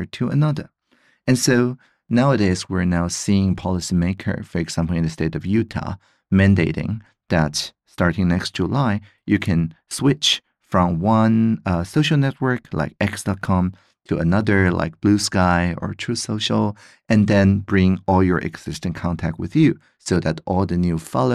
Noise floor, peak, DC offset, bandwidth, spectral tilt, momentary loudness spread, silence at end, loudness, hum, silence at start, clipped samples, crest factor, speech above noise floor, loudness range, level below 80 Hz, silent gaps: -61 dBFS; -4 dBFS; under 0.1%; 14 kHz; -5.5 dB/octave; 10 LU; 0 s; -20 LUFS; none; 0 s; under 0.1%; 16 dB; 41 dB; 2 LU; -42 dBFS; none